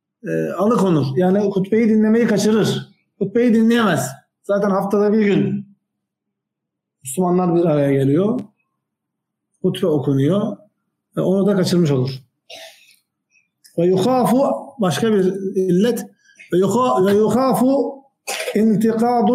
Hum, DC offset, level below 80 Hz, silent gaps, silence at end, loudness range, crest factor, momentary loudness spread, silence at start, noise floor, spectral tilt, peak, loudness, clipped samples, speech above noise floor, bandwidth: none; under 0.1%; -64 dBFS; none; 0 s; 4 LU; 12 dB; 12 LU; 0.25 s; -80 dBFS; -6.5 dB/octave; -6 dBFS; -17 LUFS; under 0.1%; 64 dB; 16 kHz